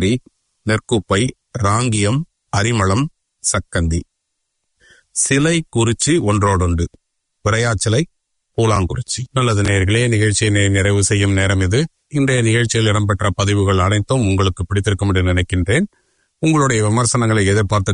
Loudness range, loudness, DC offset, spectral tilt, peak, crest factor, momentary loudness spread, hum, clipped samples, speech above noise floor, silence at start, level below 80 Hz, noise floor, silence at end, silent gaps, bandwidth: 3 LU; -17 LUFS; under 0.1%; -5 dB/octave; -2 dBFS; 14 dB; 7 LU; none; under 0.1%; 58 dB; 0 s; -40 dBFS; -73 dBFS; 0 s; none; 11 kHz